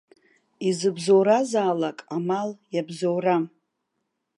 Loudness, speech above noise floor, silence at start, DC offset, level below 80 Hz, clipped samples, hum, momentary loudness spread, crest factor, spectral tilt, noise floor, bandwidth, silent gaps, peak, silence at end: -24 LUFS; 55 dB; 0.6 s; under 0.1%; -78 dBFS; under 0.1%; none; 11 LU; 18 dB; -5.5 dB/octave; -78 dBFS; 11.5 kHz; none; -8 dBFS; 0.9 s